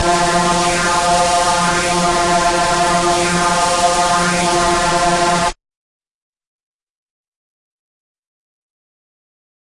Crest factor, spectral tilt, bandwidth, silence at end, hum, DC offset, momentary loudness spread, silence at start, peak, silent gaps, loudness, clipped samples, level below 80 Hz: 14 dB; -3 dB/octave; 11.5 kHz; 4.1 s; none; under 0.1%; 1 LU; 0 s; -4 dBFS; none; -14 LUFS; under 0.1%; -36 dBFS